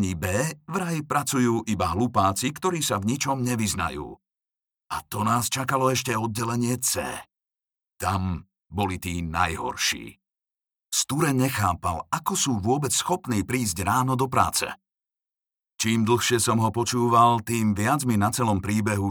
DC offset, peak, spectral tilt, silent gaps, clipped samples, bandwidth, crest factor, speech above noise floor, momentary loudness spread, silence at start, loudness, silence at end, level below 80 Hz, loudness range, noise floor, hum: under 0.1%; -4 dBFS; -4.5 dB/octave; none; under 0.1%; over 20 kHz; 20 dB; over 66 dB; 8 LU; 0 s; -24 LUFS; 0 s; -50 dBFS; 6 LU; under -90 dBFS; none